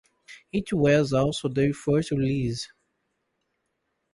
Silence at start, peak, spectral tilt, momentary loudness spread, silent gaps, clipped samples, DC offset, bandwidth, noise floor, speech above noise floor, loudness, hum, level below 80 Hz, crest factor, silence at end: 0.3 s; -8 dBFS; -6.5 dB/octave; 11 LU; none; under 0.1%; under 0.1%; 11.5 kHz; -77 dBFS; 53 dB; -25 LUFS; none; -52 dBFS; 18 dB; 1.45 s